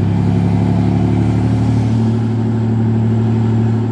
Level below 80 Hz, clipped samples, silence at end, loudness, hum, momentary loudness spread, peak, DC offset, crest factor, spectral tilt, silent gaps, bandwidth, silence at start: -32 dBFS; under 0.1%; 0 s; -15 LUFS; none; 2 LU; -2 dBFS; under 0.1%; 10 dB; -9.5 dB/octave; none; 8.2 kHz; 0 s